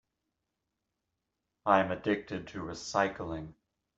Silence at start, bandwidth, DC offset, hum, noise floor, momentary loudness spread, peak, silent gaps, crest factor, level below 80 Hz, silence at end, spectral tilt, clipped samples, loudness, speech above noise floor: 1.65 s; 8.2 kHz; under 0.1%; none; -85 dBFS; 14 LU; -8 dBFS; none; 26 dB; -62 dBFS; 0.45 s; -5 dB/octave; under 0.1%; -32 LUFS; 54 dB